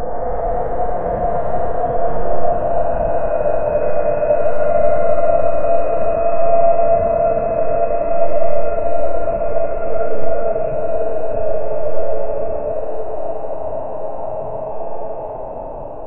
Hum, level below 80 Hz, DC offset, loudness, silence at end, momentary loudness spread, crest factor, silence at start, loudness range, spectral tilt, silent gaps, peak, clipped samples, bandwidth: none; -32 dBFS; under 0.1%; -19 LUFS; 0 s; 10 LU; 12 dB; 0 s; 8 LU; -12.5 dB/octave; none; 0 dBFS; under 0.1%; 3 kHz